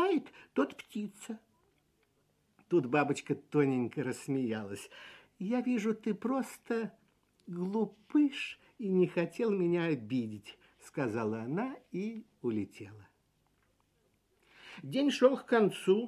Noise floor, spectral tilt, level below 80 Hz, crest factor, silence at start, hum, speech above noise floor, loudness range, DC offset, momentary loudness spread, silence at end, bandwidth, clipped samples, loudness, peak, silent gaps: -74 dBFS; -6.5 dB/octave; -78 dBFS; 22 dB; 0 s; none; 41 dB; 6 LU; under 0.1%; 16 LU; 0 s; 13.5 kHz; under 0.1%; -33 LUFS; -12 dBFS; none